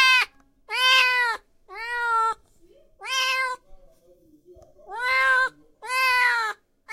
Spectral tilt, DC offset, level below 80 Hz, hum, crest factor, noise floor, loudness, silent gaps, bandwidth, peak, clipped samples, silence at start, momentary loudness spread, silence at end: 2 dB/octave; under 0.1%; -60 dBFS; none; 18 dB; -57 dBFS; -21 LUFS; none; 16.5 kHz; -6 dBFS; under 0.1%; 0 s; 21 LU; 0 s